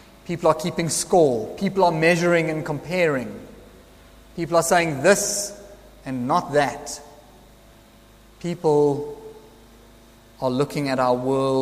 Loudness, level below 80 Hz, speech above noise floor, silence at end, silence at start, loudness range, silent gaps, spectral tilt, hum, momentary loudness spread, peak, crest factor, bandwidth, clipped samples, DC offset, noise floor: -21 LUFS; -52 dBFS; 29 dB; 0 s; 0.25 s; 6 LU; none; -4.5 dB/octave; none; 16 LU; -4 dBFS; 20 dB; 15.5 kHz; under 0.1%; under 0.1%; -50 dBFS